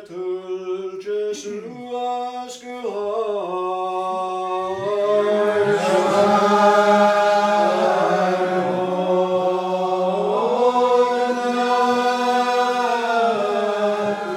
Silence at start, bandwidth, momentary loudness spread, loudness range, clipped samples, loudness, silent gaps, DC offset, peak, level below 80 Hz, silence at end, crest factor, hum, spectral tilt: 0 s; 13.5 kHz; 12 LU; 9 LU; under 0.1%; -19 LUFS; none; under 0.1%; -4 dBFS; -72 dBFS; 0 s; 16 dB; none; -5 dB/octave